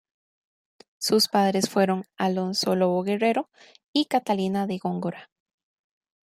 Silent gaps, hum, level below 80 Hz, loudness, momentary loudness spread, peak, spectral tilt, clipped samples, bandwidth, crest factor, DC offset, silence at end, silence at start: 3.84-3.94 s; none; -72 dBFS; -24 LUFS; 9 LU; -8 dBFS; -4.5 dB/octave; under 0.1%; 15.5 kHz; 18 dB; under 0.1%; 1 s; 1 s